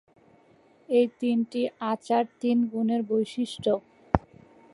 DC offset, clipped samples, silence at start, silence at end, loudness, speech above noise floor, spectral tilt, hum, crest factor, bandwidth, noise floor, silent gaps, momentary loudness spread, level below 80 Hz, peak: under 0.1%; under 0.1%; 0.9 s; 0.55 s; -27 LUFS; 33 dB; -7 dB/octave; none; 26 dB; 11 kHz; -59 dBFS; none; 5 LU; -48 dBFS; -2 dBFS